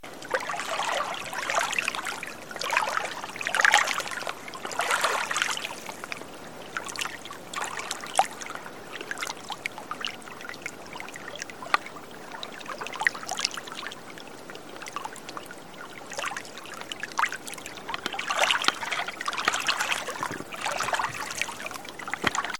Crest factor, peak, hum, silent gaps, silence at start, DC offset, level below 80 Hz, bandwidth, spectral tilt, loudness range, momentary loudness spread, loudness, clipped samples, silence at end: 30 dB; 0 dBFS; none; none; 0.05 s; 0.4%; -66 dBFS; 17 kHz; -0.5 dB/octave; 8 LU; 14 LU; -29 LUFS; under 0.1%; 0 s